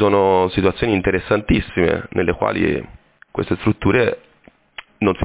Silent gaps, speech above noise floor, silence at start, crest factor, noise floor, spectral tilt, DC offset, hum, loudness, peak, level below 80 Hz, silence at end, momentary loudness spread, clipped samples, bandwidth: none; 35 dB; 0 s; 16 dB; -52 dBFS; -11 dB/octave; under 0.1%; none; -18 LUFS; -4 dBFS; -36 dBFS; 0 s; 15 LU; under 0.1%; 4 kHz